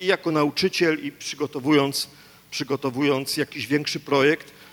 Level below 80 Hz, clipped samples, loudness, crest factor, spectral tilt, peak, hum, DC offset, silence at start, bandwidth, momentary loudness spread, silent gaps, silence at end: -66 dBFS; under 0.1%; -23 LUFS; 18 dB; -4.5 dB/octave; -6 dBFS; none; under 0.1%; 0 s; 18.5 kHz; 9 LU; none; 0.1 s